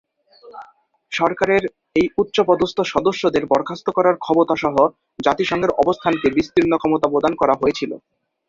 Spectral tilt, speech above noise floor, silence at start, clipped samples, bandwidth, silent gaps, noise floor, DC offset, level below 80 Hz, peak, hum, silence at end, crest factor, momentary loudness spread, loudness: -5.5 dB/octave; 33 dB; 0.45 s; under 0.1%; 7.6 kHz; none; -51 dBFS; under 0.1%; -50 dBFS; -2 dBFS; none; 0.5 s; 18 dB; 4 LU; -19 LUFS